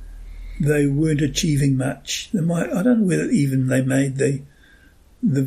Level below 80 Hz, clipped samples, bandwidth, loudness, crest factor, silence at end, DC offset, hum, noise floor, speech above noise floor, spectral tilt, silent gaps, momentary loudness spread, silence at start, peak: -40 dBFS; under 0.1%; 15 kHz; -20 LUFS; 14 dB; 0 s; under 0.1%; none; -50 dBFS; 31 dB; -6 dB/octave; none; 7 LU; 0 s; -6 dBFS